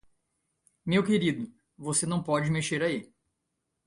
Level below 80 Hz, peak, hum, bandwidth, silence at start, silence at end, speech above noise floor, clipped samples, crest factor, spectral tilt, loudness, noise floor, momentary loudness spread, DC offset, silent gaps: -62 dBFS; -12 dBFS; none; 11.5 kHz; 0.85 s; 0.8 s; 54 dB; under 0.1%; 18 dB; -4.5 dB/octave; -28 LUFS; -82 dBFS; 13 LU; under 0.1%; none